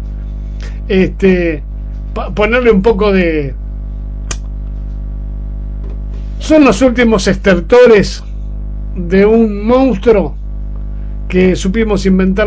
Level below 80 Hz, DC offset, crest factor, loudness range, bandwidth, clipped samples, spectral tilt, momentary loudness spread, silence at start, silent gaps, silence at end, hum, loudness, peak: -20 dBFS; under 0.1%; 12 dB; 6 LU; 8 kHz; 0.5%; -6.5 dB/octave; 16 LU; 0 s; none; 0 s; 50 Hz at -20 dBFS; -11 LUFS; 0 dBFS